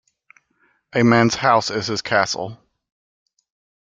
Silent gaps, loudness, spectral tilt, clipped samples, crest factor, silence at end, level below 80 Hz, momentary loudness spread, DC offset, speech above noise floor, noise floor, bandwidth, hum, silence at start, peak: none; -18 LUFS; -4.5 dB/octave; under 0.1%; 20 dB; 1.25 s; -58 dBFS; 11 LU; under 0.1%; 46 dB; -64 dBFS; 7.8 kHz; none; 0.95 s; -2 dBFS